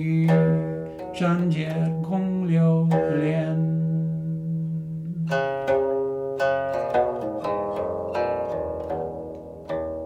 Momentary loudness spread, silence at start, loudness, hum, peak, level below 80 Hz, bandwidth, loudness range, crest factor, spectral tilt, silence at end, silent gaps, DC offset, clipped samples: 10 LU; 0 s; -25 LUFS; none; -8 dBFS; -52 dBFS; 7.4 kHz; 3 LU; 16 dB; -9 dB/octave; 0 s; none; under 0.1%; under 0.1%